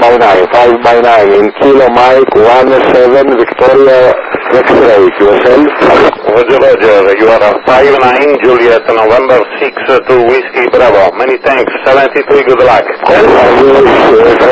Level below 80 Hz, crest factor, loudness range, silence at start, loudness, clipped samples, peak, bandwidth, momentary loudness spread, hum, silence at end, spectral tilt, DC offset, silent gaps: -38 dBFS; 4 dB; 2 LU; 0 s; -5 LUFS; 9%; 0 dBFS; 8 kHz; 4 LU; none; 0 s; -6 dB/octave; under 0.1%; none